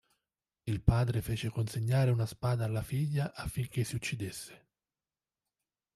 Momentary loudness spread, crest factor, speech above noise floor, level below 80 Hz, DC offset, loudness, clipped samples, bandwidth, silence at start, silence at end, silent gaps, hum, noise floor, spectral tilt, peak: 10 LU; 24 dB; over 58 dB; -48 dBFS; under 0.1%; -33 LUFS; under 0.1%; 13.5 kHz; 0.65 s; 1.4 s; none; none; under -90 dBFS; -6.5 dB/octave; -10 dBFS